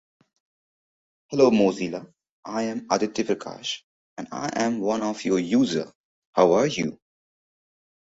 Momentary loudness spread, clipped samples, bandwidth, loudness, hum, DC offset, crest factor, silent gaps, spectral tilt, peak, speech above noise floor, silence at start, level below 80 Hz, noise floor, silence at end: 16 LU; under 0.1%; 8 kHz; -24 LUFS; none; under 0.1%; 22 dB; 2.31-2.43 s, 3.84-4.17 s, 5.95-6.33 s; -5 dB/octave; -4 dBFS; over 67 dB; 1.3 s; -64 dBFS; under -90 dBFS; 1.25 s